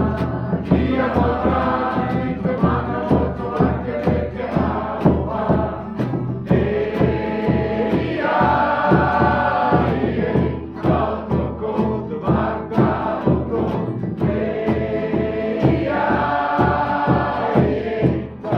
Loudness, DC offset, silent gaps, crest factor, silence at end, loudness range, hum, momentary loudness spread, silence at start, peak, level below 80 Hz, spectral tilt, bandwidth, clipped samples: -20 LUFS; under 0.1%; none; 18 dB; 0 s; 3 LU; none; 6 LU; 0 s; -2 dBFS; -34 dBFS; -9.5 dB/octave; 6.2 kHz; under 0.1%